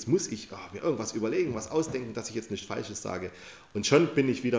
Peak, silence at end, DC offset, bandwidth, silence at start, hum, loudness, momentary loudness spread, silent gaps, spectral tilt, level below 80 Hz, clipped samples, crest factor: -10 dBFS; 0 s; under 0.1%; 8 kHz; 0 s; none; -30 LUFS; 15 LU; none; -5 dB/octave; -60 dBFS; under 0.1%; 20 dB